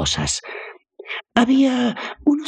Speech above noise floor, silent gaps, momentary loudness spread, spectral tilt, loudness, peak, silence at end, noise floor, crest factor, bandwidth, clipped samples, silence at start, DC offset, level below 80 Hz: 20 dB; none; 17 LU; -4 dB/octave; -19 LUFS; -2 dBFS; 0 s; -39 dBFS; 20 dB; 10.5 kHz; under 0.1%; 0 s; under 0.1%; -44 dBFS